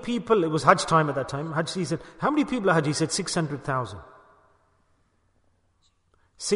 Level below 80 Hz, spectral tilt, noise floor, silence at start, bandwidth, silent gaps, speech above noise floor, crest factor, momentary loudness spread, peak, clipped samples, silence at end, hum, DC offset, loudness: -58 dBFS; -5 dB/octave; -67 dBFS; 0 s; 11 kHz; none; 42 dB; 24 dB; 10 LU; -2 dBFS; under 0.1%; 0 s; none; under 0.1%; -25 LUFS